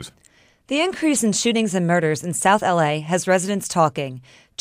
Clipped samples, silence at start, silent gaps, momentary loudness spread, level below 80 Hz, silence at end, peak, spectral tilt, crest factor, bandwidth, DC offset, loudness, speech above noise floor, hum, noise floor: under 0.1%; 0 s; none; 12 LU; -62 dBFS; 0.4 s; -4 dBFS; -4 dB/octave; 18 dB; 15.5 kHz; under 0.1%; -20 LUFS; 36 dB; none; -56 dBFS